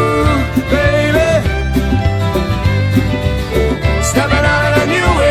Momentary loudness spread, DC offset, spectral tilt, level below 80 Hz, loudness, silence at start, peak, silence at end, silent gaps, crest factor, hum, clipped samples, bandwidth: 4 LU; 0.7%; -5.5 dB/octave; -20 dBFS; -13 LUFS; 0 s; -2 dBFS; 0 s; none; 12 dB; none; under 0.1%; 15.5 kHz